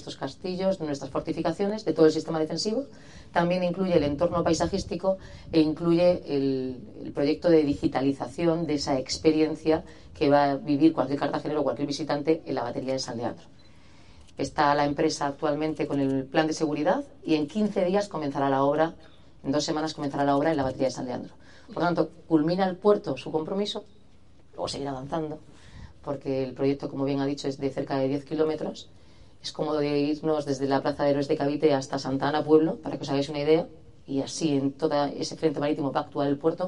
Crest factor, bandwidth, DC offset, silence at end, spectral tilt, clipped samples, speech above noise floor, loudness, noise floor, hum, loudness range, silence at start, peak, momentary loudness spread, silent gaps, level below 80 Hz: 20 dB; 11 kHz; 0.3%; 0 s; -6 dB/octave; under 0.1%; 31 dB; -27 LUFS; -57 dBFS; none; 5 LU; 0 s; -8 dBFS; 11 LU; none; -56 dBFS